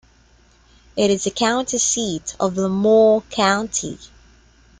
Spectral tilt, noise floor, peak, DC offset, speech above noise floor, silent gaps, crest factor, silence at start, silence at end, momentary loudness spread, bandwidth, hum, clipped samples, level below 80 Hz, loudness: -3.5 dB/octave; -53 dBFS; -4 dBFS; under 0.1%; 35 dB; none; 16 dB; 0.95 s; 0.75 s; 11 LU; 10 kHz; none; under 0.1%; -52 dBFS; -18 LUFS